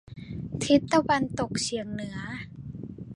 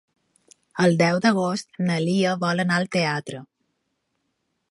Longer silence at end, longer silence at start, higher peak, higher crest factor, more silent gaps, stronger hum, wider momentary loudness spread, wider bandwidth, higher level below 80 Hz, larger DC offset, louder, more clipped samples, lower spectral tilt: second, 0 s vs 1.25 s; second, 0.05 s vs 0.75 s; about the same, -8 dBFS vs -6 dBFS; about the same, 20 dB vs 18 dB; neither; neither; first, 18 LU vs 12 LU; about the same, 11.5 kHz vs 11.5 kHz; first, -52 dBFS vs -68 dBFS; neither; second, -27 LUFS vs -22 LUFS; neither; about the same, -5 dB/octave vs -5.5 dB/octave